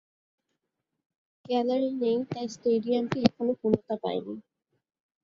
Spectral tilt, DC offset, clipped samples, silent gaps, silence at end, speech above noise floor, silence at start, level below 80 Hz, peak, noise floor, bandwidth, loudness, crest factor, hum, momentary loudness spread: -6.5 dB/octave; under 0.1%; under 0.1%; none; 0.85 s; 56 dB; 1.5 s; -66 dBFS; -6 dBFS; -84 dBFS; 7.4 kHz; -28 LUFS; 24 dB; none; 9 LU